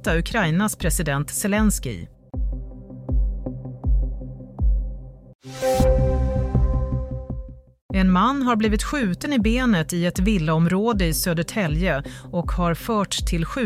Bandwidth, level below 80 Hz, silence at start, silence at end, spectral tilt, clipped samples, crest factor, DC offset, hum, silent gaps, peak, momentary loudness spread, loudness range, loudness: 16 kHz; -28 dBFS; 0 s; 0 s; -5.5 dB/octave; under 0.1%; 14 dB; under 0.1%; none; 5.35-5.39 s, 7.81-7.89 s; -6 dBFS; 14 LU; 7 LU; -22 LUFS